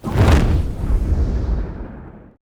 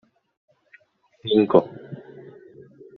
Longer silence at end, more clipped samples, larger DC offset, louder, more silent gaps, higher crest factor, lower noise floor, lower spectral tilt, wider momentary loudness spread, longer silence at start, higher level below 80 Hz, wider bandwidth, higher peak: second, 0.3 s vs 0.95 s; neither; neither; about the same, -19 LUFS vs -19 LUFS; neither; second, 16 dB vs 24 dB; second, -37 dBFS vs -57 dBFS; first, -7.5 dB/octave vs -5.5 dB/octave; second, 19 LU vs 26 LU; second, 0.05 s vs 1.25 s; first, -20 dBFS vs -66 dBFS; first, 13.5 kHz vs 4.6 kHz; about the same, -2 dBFS vs -2 dBFS